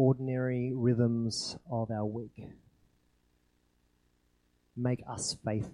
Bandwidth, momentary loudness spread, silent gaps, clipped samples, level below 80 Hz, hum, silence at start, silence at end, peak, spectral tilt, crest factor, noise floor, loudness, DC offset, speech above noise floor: 11.5 kHz; 17 LU; none; under 0.1%; -64 dBFS; 60 Hz at -60 dBFS; 0 s; 0 s; -14 dBFS; -6 dB/octave; 20 dB; -72 dBFS; -33 LUFS; under 0.1%; 40 dB